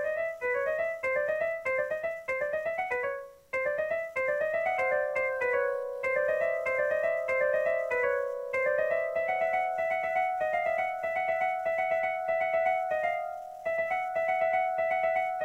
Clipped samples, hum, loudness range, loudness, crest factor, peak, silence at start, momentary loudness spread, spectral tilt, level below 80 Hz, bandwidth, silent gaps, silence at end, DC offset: under 0.1%; none; 3 LU; -29 LUFS; 14 dB; -16 dBFS; 0 s; 4 LU; -4 dB/octave; -68 dBFS; 16 kHz; none; 0 s; under 0.1%